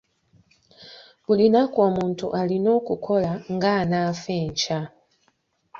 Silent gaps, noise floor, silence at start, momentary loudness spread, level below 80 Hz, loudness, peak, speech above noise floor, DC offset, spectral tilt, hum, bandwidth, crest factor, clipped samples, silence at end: none; -68 dBFS; 0.8 s; 9 LU; -58 dBFS; -22 LUFS; -6 dBFS; 46 dB; under 0.1%; -6 dB/octave; none; 7.4 kHz; 18 dB; under 0.1%; 0 s